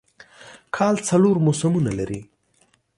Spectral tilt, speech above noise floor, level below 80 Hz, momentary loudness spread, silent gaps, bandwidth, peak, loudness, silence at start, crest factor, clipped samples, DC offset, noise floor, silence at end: -6.5 dB/octave; 43 dB; -52 dBFS; 13 LU; none; 11.5 kHz; -6 dBFS; -21 LUFS; 0.4 s; 16 dB; under 0.1%; under 0.1%; -63 dBFS; 0.75 s